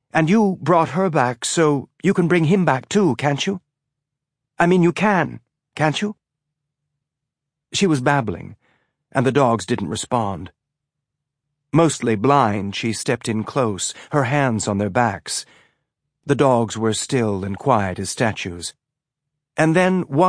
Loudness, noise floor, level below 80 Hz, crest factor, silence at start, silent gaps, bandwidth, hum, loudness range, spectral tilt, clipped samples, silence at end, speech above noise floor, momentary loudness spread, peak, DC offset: -19 LUFS; -83 dBFS; -58 dBFS; 18 dB; 0.15 s; none; 10.5 kHz; none; 4 LU; -5.5 dB/octave; under 0.1%; 0 s; 64 dB; 10 LU; -2 dBFS; under 0.1%